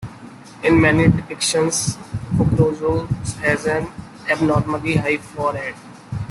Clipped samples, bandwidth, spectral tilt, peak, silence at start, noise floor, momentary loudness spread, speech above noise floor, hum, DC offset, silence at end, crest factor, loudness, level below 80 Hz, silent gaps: under 0.1%; 12.5 kHz; -5 dB/octave; -2 dBFS; 0 s; -39 dBFS; 16 LU; 21 dB; none; under 0.1%; 0 s; 18 dB; -19 LUFS; -40 dBFS; none